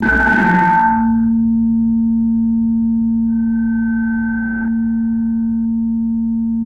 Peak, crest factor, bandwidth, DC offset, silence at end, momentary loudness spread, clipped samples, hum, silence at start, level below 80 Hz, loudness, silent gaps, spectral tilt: -2 dBFS; 12 dB; 4.3 kHz; under 0.1%; 0 s; 6 LU; under 0.1%; none; 0 s; -34 dBFS; -15 LUFS; none; -8.5 dB/octave